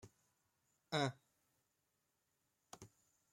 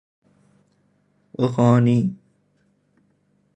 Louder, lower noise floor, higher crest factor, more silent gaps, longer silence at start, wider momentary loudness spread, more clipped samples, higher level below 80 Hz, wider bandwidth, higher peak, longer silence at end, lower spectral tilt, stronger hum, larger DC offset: second, -42 LUFS vs -19 LUFS; first, -85 dBFS vs -64 dBFS; first, 26 dB vs 20 dB; neither; second, 0.05 s vs 1.4 s; about the same, 22 LU vs 22 LU; neither; second, -84 dBFS vs -60 dBFS; first, 16 kHz vs 8.6 kHz; second, -24 dBFS vs -4 dBFS; second, 0.45 s vs 1.4 s; second, -4.5 dB/octave vs -9 dB/octave; second, none vs 50 Hz at -55 dBFS; neither